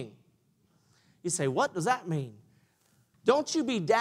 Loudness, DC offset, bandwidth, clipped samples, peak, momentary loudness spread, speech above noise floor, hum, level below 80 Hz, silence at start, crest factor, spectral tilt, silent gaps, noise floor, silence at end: -29 LUFS; under 0.1%; 15 kHz; under 0.1%; -10 dBFS; 12 LU; 41 dB; none; -76 dBFS; 0 s; 22 dB; -4.5 dB/octave; none; -69 dBFS; 0 s